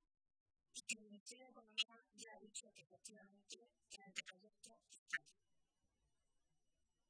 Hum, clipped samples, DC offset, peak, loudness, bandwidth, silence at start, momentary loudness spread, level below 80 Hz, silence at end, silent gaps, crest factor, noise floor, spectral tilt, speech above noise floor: none; under 0.1%; under 0.1%; -26 dBFS; -51 LUFS; 11 kHz; 0.75 s; 19 LU; under -90 dBFS; 1.8 s; 1.20-1.26 s, 4.98-5.06 s; 30 dB; -87 dBFS; 0.5 dB/octave; 32 dB